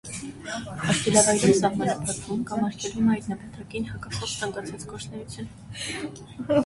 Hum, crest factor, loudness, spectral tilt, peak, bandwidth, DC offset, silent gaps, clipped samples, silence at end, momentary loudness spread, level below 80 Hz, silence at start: none; 22 dB; -26 LUFS; -4 dB/octave; -4 dBFS; 11.5 kHz; under 0.1%; none; under 0.1%; 0 s; 18 LU; -52 dBFS; 0.05 s